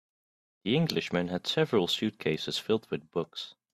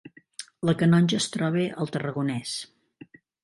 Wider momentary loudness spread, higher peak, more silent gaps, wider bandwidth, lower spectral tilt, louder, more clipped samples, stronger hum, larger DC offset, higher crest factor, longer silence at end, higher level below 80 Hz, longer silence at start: second, 8 LU vs 21 LU; second, -12 dBFS vs -8 dBFS; neither; first, 14 kHz vs 11.5 kHz; about the same, -5.5 dB/octave vs -5.5 dB/octave; second, -30 LUFS vs -25 LUFS; neither; neither; neither; about the same, 20 dB vs 18 dB; second, 0.2 s vs 0.8 s; about the same, -68 dBFS vs -64 dBFS; first, 0.65 s vs 0.05 s